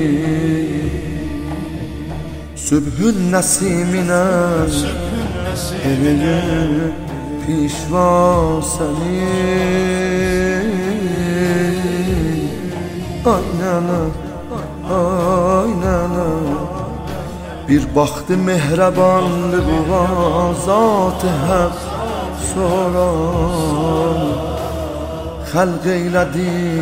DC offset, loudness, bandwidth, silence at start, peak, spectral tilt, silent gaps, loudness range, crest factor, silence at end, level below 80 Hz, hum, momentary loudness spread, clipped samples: 0.6%; -17 LUFS; 16 kHz; 0 s; -2 dBFS; -6 dB/octave; none; 3 LU; 16 dB; 0 s; -30 dBFS; none; 11 LU; under 0.1%